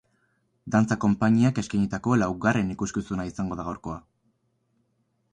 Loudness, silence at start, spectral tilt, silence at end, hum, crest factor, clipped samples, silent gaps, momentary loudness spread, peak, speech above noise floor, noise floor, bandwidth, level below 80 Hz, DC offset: -25 LUFS; 0.65 s; -7 dB/octave; 1.35 s; none; 18 dB; under 0.1%; none; 13 LU; -8 dBFS; 47 dB; -72 dBFS; 9.6 kHz; -52 dBFS; under 0.1%